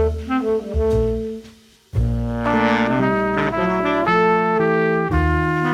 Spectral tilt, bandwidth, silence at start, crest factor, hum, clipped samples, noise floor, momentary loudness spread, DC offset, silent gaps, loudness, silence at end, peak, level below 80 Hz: -7.5 dB/octave; 12 kHz; 0 s; 14 dB; none; under 0.1%; -46 dBFS; 6 LU; under 0.1%; none; -19 LUFS; 0 s; -4 dBFS; -30 dBFS